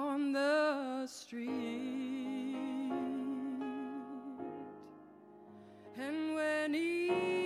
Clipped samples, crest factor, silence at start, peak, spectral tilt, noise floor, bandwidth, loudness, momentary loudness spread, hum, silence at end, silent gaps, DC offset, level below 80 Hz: under 0.1%; 16 dB; 0 s; -22 dBFS; -4.5 dB/octave; -57 dBFS; 14 kHz; -37 LUFS; 23 LU; none; 0 s; none; under 0.1%; -86 dBFS